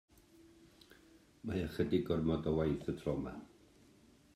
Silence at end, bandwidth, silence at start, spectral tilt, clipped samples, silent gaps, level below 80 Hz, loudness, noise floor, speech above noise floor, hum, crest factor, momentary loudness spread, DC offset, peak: 0.9 s; 14.5 kHz; 0.4 s; -8 dB/octave; under 0.1%; none; -58 dBFS; -37 LUFS; -65 dBFS; 29 dB; none; 20 dB; 12 LU; under 0.1%; -20 dBFS